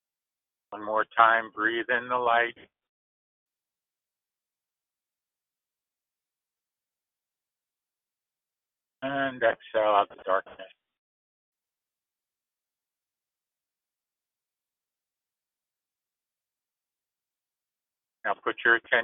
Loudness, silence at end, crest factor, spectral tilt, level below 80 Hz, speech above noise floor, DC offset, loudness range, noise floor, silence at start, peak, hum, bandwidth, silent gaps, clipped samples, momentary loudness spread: -26 LUFS; 0 s; 28 dB; -0.5 dB/octave; -76 dBFS; over 64 dB; under 0.1%; 12 LU; under -90 dBFS; 0.7 s; -4 dBFS; none; 3.9 kHz; 2.89-3.46 s, 10.98-11.53 s; under 0.1%; 12 LU